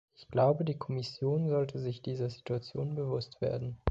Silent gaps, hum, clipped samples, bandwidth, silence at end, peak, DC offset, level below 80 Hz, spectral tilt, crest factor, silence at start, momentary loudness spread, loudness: none; none; under 0.1%; 7.8 kHz; 0 s; -10 dBFS; under 0.1%; -52 dBFS; -8.5 dB/octave; 22 dB; 0.2 s; 9 LU; -34 LUFS